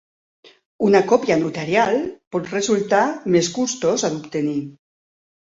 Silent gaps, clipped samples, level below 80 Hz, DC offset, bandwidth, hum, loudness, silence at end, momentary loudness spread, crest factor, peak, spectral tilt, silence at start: 2.27-2.31 s; under 0.1%; -60 dBFS; under 0.1%; 8 kHz; none; -20 LUFS; 0.7 s; 8 LU; 18 dB; -2 dBFS; -4.5 dB/octave; 0.8 s